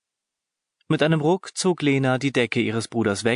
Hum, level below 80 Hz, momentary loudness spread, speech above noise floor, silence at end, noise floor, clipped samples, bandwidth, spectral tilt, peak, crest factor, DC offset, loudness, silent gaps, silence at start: none; -60 dBFS; 4 LU; 64 dB; 0 s; -85 dBFS; under 0.1%; 11 kHz; -5.5 dB/octave; -6 dBFS; 16 dB; under 0.1%; -22 LUFS; none; 0.9 s